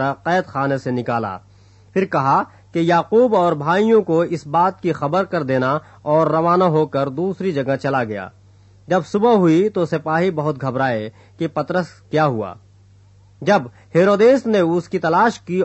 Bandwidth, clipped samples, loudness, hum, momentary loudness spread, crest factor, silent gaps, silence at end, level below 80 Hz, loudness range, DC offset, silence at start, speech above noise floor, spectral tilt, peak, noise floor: 8.4 kHz; under 0.1%; -18 LUFS; none; 9 LU; 14 dB; none; 0 s; -60 dBFS; 4 LU; under 0.1%; 0 s; 31 dB; -7.5 dB/octave; -4 dBFS; -49 dBFS